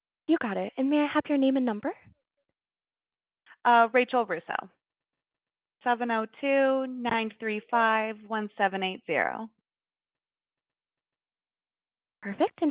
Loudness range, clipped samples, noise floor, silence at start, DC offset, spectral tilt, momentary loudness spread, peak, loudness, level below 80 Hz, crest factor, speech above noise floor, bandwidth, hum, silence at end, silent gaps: 8 LU; under 0.1%; under -90 dBFS; 0.3 s; under 0.1%; -2.5 dB/octave; 11 LU; -8 dBFS; -27 LUFS; -76 dBFS; 20 dB; over 63 dB; 4 kHz; none; 0 s; none